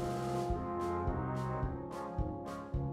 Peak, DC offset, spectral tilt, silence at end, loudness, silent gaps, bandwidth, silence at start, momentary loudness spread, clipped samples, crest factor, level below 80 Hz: -24 dBFS; under 0.1%; -7.5 dB/octave; 0 s; -38 LUFS; none; 14 kHz; 0 s; 5 LU; under 0.1%; 14 dB; -46 dBFS